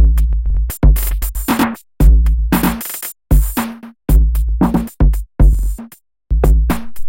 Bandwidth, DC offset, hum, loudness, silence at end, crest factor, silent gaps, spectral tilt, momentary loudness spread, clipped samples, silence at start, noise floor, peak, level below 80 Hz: 17 kHz; under 0.1%; none; -16 LUFS; 0 s; 12 dB; none; -6.5 dB/octave; 8 LU; under 0.1%; 0 s; -38 dBFS; -2 dBFS; -14 dBFS